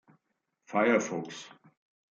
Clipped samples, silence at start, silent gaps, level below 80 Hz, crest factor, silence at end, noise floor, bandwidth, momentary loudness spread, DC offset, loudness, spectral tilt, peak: under 0.1%; 0.7 s; none; -82 dBFS; 22 dB; 0.65 s; -81 dBFS; 7.8 kHz; 19 LU; under 0.1%; -29 LUFS; -4.5 dB/octave; -12 dBFS